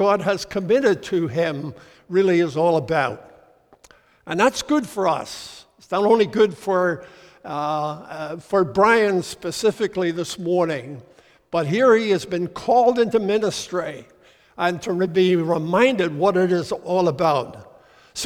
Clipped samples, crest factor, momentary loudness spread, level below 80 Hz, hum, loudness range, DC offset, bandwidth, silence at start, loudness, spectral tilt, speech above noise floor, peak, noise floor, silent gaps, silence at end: under 0.1%; 18 dB; 15 LU; -58 dBFS; none; 2 LU; under 0.1%; 16.5 kHz; 0 s; -20 LUFS; -5.5 dB/octave; 33 dB; -2 dBFS; -53 dBFS; none; 0 s